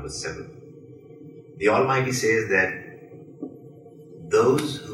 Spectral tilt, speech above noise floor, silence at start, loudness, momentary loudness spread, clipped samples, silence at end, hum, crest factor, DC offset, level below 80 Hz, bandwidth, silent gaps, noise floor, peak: -4.5 dB/octave; 23 dB; 0 s; -22 LUFS; 25 LU; under 0.1%; 0 s; none; 18 dB; under 0.1%; -56 dBFS; 15.5 kHz; none; -45 dBFS; -6 dBFS